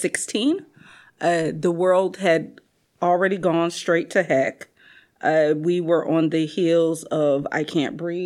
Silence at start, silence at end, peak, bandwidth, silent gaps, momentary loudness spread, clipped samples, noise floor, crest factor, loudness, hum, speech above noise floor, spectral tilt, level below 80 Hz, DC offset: 0 s; 0 s; -4 dBFS; 13 kHz; none; 5 LU; under 0.1%; -53 dBFS; 18 dB; -21 LUFS; none; 32 dB; -5 dB/octave; -72 dBFS; under 0.1%